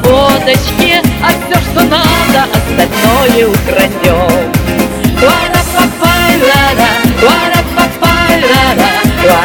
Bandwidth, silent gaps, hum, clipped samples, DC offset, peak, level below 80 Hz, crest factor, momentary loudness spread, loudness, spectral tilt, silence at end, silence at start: over 20 kHz; none; none; 2%; under 0.1%; 0 dBFS; -24 dBFS; 8 dB; 4 LU; -8 LUFS; -4.5 dB/octave; 0 s; 0 s